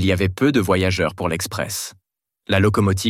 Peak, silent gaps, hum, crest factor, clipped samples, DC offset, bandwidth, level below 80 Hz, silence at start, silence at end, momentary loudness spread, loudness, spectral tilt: -4 dBFS; none; none; 16 dB; under 0.1%; under 0.1%; 16 kHz; -44 dBFS; 0 s; 0 s; 8 LU; -20 LUFS; -5 dB/octave